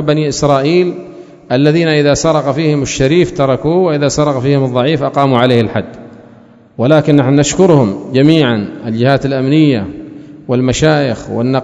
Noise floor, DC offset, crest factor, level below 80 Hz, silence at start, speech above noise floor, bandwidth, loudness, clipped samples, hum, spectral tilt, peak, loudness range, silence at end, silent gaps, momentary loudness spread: -41 dBFS; under 0.1%; 12 dB; -40 dBFS; 0 s; 30 dB; 8 kHz; -11 LUFS; 0.4%; none; -6 dB/octave; 0 dBFS; 2 LU; 0 s; none; 9 LU